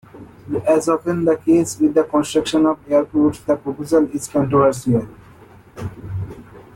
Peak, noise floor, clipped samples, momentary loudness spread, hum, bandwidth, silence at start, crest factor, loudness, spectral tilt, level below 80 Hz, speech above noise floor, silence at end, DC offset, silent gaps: -4 dBFS; -45 dBFS; under 0.1%; 14 LU; none; 15.5 kHz; 0.15 s; 14 dB; -18 LUFS; -6.5 dB/octave; -50 dBFS; 27 dB; 0.15 s; under 0.1%; none